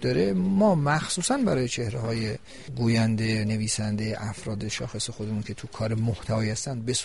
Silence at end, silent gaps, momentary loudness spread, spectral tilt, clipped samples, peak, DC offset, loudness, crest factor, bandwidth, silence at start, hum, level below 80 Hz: 0 s; none; 10 LU; -5 dB/octave; under 0.1%; -10 dBFS; 0.4%; -26 LUFS; 16 dB; 11.5 kHz; 0 s; none; -50 dBFS